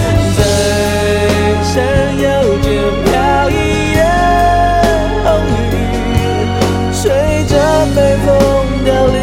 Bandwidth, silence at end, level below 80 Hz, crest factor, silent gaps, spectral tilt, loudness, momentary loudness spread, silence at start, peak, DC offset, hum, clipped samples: 16.5 kHz; 0 s; -20 dBFS; 10 dB; none; -5.5 dB/octave; -12 LUFS; 4 LU; 0 s; 0 dBFS; under 0.1%; none; under 0.1%